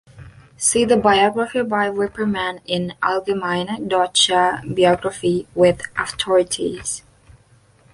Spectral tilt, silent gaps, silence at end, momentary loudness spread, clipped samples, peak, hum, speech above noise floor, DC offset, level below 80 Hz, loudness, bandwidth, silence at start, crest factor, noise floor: -3.5 dB/octave; none; 0.95 s; 9 LU; under 0.1%; -2 dBFS; none; 35 dB; under 0.1%; -50 dBFS; -19 LUFS; 11.5 kHz; 0.15 s; 18 dB; -54 dBFS